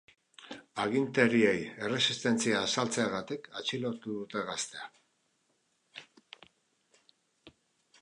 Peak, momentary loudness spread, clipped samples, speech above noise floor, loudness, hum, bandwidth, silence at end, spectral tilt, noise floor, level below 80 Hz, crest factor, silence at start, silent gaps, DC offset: -10 dBFS; 21 LU; under 0.1%; 44 dB; -31 LUFS; none; 11 kHz; 0.55 s; -3.5 dB/octave; -75 dBFS; -74 dBFS; 24 dB; 0.4 s; none; under 0.1%